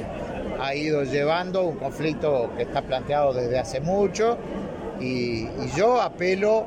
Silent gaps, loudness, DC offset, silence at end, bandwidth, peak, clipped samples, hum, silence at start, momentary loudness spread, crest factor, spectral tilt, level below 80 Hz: none; -25 LUFS; under 0.1%; 0 s; 15.5 kHz; -10 dBFS; under 0.1%; none; 0 s; 9 LU; 14 dB; -6 dB/octave; -46 dBFS